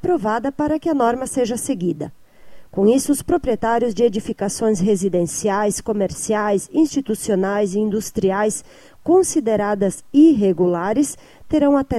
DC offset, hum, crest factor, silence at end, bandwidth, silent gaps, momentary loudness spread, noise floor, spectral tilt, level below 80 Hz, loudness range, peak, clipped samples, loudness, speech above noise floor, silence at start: under 0.1%; none; 14 dB; 0 s; 15 kHz; none; 7 LU; -40 dBFS; -5.5 dB/octave; -46 dBFS; 3 LU; -4 dBFS; under 0.1%; -19 LUFS; 22 dB; 0 s